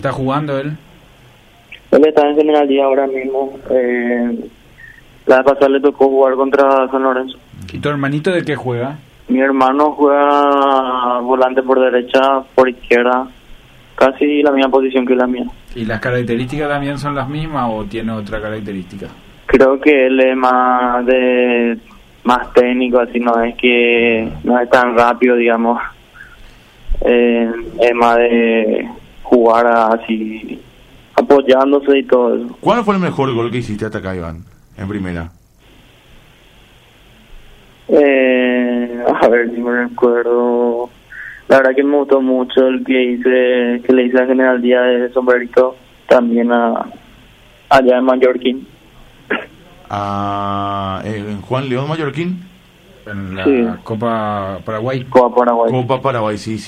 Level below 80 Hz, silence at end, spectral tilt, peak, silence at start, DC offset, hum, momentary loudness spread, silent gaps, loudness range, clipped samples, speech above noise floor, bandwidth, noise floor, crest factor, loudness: -40 dBFS; 0 s; -7 dB/octave; 0 dBFS; 0 s; under 0.1%; none; 12 LU; none; 7 LU; under 0.1%; 33 dB; 11 kHz; -46 dBFS; 14 dB; -14 LUFS